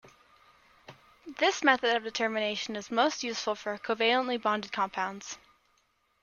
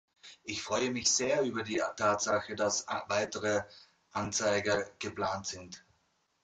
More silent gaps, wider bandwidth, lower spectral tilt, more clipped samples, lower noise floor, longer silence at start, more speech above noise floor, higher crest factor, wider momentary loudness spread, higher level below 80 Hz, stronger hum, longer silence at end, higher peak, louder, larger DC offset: neither; about the same, 10 kHz vs 9.6 kHz; about the same, -2.5 dB/octave vs -2.5 dB/octave; neither; about the same, -72 dBFS vs -75 dBFS; second, 0.05 s vs 0.25 s; about the same, 42 dB vs 43 dB; first, 24 dB vs 18 dB; second, 10 LU vs 13 LU; second, -74 dBFS vs -64 dBFS; neither; first, 0.85 s vs 0.65 s; first, -8 dBFS vs -16 dBFS; first, -29 LUFS vs -32 LUFS; neither